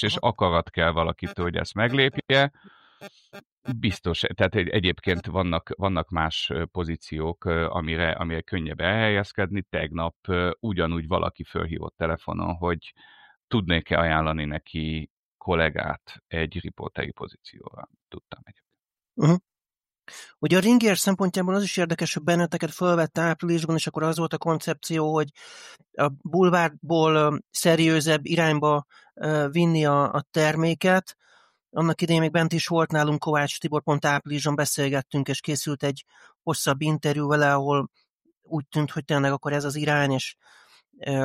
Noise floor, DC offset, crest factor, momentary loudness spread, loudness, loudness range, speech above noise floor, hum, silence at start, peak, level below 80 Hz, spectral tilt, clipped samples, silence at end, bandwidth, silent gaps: under -90 dBFS; under 0.1%; 18 dB; 12 LU; -24 LUFS; 6 LU; over 66 dB; none; 0 s; -6 dBFS; -46 dBFS; -5 dB/octave; under 0.1%; 0 s; 15 kHz; 3.52-3.62 s, 10.16-10.23 s, 13.37-13.48 s, 15.10-15.39 s, 38.10-38.19 s, 38.37-38.41 s